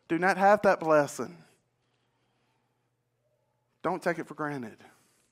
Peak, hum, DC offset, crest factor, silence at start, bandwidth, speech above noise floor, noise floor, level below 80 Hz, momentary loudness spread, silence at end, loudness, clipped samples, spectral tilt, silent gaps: -8 dBFS; none; under 0.1%; 22 dB; 0.1 s; 15.5 kHz; 50 dB; -76 dBFS; -74 dBFS; 17 LU; 0.55 s; -27 LUFS; under 0.1%; -5.5 dB/octave; none